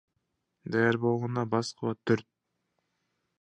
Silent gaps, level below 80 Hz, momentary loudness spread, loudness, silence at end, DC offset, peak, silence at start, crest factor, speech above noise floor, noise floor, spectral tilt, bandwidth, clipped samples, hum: none; -70 dBFS; 8 LU; -29 LUFS; 1.2 s; under 0.1%; -12 dBFS; 0.65 s; 20 dB; 52 dB; -80 dBFS; -6.5 dB/octave; 9.8 kHz; under 0.1%; none